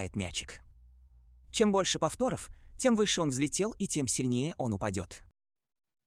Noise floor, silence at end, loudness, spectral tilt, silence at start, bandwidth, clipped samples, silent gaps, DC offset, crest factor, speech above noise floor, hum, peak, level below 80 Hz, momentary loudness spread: -59 dBFS; 0.9 s; -31 LUFS; -4 dB/octave; 0 s; 14 kHz; under 0.1%; none; under 0.1%; 20 dB; 28 dB; none; -14 dBFS; -56 dBFS; 16 LU